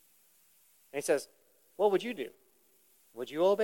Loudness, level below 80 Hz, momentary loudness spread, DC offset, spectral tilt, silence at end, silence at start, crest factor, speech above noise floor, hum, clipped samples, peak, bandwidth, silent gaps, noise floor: -33 LUFS; -88 dBFS; 22 LU; under 0.1%; -4 dB/octave; 0 s; 0.95 s; 20 dB; 37 dB; none; under 0.1%; -14 dBFS; 17.5 kHz; none; -67 dBFS